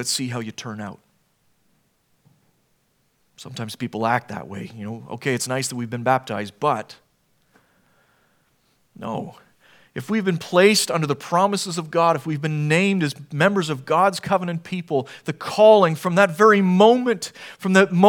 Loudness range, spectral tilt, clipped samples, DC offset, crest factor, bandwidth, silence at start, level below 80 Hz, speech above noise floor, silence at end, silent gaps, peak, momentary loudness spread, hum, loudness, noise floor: 16 LU; -5 dB/octave; under 0.1%; under 0.1%; 22 dB; 18 kHz; 0 s; -70 dBFS; 46 dB; 0 s; none; 0 dBFS; 18 LU; none; -20 LUFS; -66 dBFS